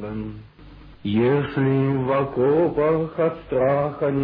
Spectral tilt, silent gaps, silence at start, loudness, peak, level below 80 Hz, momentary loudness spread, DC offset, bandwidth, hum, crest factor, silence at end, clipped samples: -11.5 dB/octave; none; 0 s; -21 LUFS; -8 dBFS; -48 dBFS; 13 LU; under 0.1%; 5 kHz; none; 12 dB; 0 s; under 0.1%